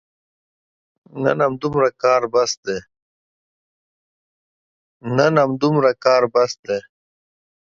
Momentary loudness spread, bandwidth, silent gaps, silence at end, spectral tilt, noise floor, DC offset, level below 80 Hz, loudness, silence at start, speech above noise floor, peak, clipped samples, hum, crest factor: 11 LU; 7.6 kHz; 2.57-2.63 s, 3.02-5.00 s, 6.59-6.63 s; 0.95 s; -5.5 dB/octave; under -90 dBFS; under 0.1%; -60 dBFS; -18 LUFS; 1.15 s; over 72 dB; 0 dBFS; under 0.1%; none; 20 dB